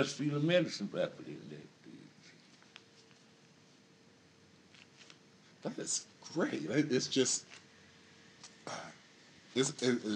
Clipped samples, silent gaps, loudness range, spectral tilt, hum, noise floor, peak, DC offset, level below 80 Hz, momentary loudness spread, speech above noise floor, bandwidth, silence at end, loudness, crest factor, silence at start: under 0.1%; none; 19 LU; -4 dB/octave; none; -63 dBFS; -18 dBFS; under 0.1%; -88 dBFS; 26 LU; 29 dB; 11 kHz; 0 s; -35 LUFS; 22 dB; 0 s